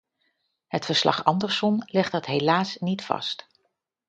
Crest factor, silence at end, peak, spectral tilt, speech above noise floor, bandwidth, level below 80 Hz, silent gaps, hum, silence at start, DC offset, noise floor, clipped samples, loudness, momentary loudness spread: 22 dB; 0.7 s; -4 dBFS; -5 dB/octave; 51 dB; 9 kHz; -68 dBFS; none; none; 0.7 s; under 0.1%; -75 dBFS; under 0.1%; -24 LUFS; 9 LU